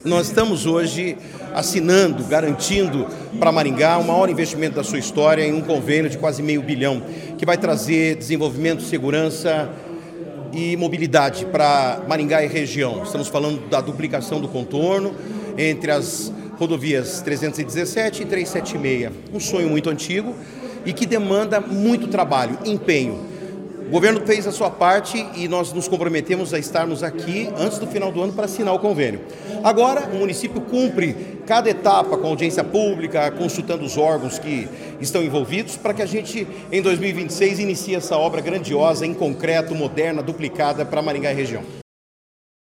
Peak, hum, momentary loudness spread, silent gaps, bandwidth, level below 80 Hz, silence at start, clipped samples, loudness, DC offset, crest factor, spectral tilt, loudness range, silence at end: 0 dBFS; none; 10 LU; none; 17 kHz; -54 dBFS; 0 s; under 0.1%; -20 LUFS; under 0.1%; 20 dB; -5 dB/octave; 4 LU; 0.95 s